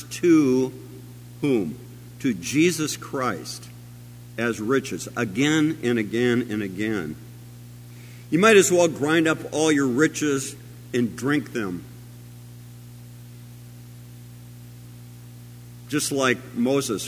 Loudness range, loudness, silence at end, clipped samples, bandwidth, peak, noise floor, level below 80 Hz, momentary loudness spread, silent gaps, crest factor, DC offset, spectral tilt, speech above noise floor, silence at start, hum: 17 LU; -22 LUFS; 0 s; under 0.1%; 16 kHz; -2 dBFS; -42 dBFS; -58 dBFS; 24 LU; none; 22 dB; under 0.1%; -4.5 dB/octave; 20 dB; 0 s; 60 Hz at -40 dBFS